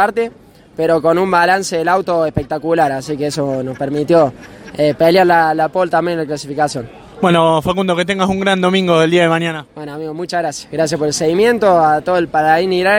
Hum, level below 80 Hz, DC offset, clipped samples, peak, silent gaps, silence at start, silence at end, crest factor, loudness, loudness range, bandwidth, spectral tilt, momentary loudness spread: none; -46 dBFS; under 0.1%; under 0.1%; 0 dBFS; none; 0 s; 0 s; 14 dB; -14 LUFS; 1 LU; 16.5 kHz; -5 dB/octave; 10 LU